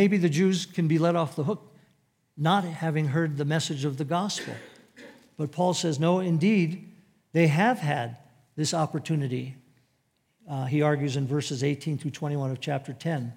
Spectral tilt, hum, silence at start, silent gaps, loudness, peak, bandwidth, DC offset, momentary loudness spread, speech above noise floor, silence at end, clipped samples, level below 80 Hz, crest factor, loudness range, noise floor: -6 dB/octave; none; 0 s; none; -27 LUFS; -8 dBFS; 15.5 kHz; under 0.1%; 11 LU; 46 dB; 0.05 s; under 0.1%; -78 dBFS; 18 dB; 4 LU; -72 dBFS